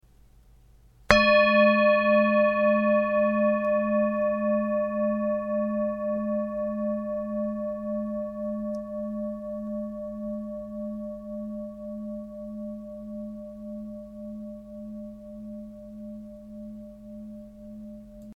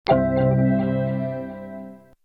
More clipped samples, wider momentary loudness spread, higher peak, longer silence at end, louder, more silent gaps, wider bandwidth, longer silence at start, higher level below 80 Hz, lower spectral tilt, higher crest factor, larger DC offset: neither; first, 22 LU vs 18 LU; first, 0 dBFS vs -6 dBFS; second, 0 s vs 0.3 s; second, -26 LUFS vs -22 LUFS; neither; first, 8 kHz vs 5.8 kHz; first, 1.1 s vs 0.05 s; second, -52 dBFS vs -44 dBFS; second, -6.5 dB/octave vs -10.5 dB/octave; first, 26 dB vs 16 dB; neither